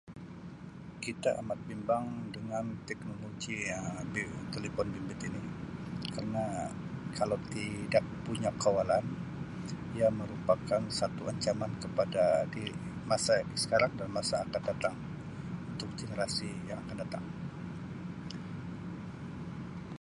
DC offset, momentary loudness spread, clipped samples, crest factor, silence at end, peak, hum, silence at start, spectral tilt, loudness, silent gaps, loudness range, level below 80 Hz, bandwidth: under 0.1%; 13 LU; under 0.1%; 22 dB; 0.05 s; -14 dBFS; none; 0.05 s; -5 dB/octave; -35 LUFS; none; 8 LU; -58 dBFS; 11.5 kHz